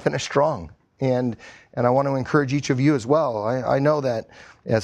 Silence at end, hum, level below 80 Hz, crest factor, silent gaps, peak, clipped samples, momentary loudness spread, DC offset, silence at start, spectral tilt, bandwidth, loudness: 0 s; none; -54 dBFS; 18 dB; none; -4 dBFS; under 0.1%; 10 LU; under 0.1%; 0 s; -6.5 dB/octave; 9.8 kHz; -22 LUFS